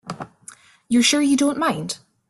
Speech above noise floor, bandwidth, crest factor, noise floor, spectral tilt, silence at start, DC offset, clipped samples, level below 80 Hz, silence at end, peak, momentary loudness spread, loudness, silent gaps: 28 dB; 12.5 kHz; 18 dB; -47 dBFS; -3 dB/octave; 0.05 s; under 0.1%; under 0.1%; -62 dBFS; 0.35 s; -4 dBFS; 19 LU; -19 LUFS; none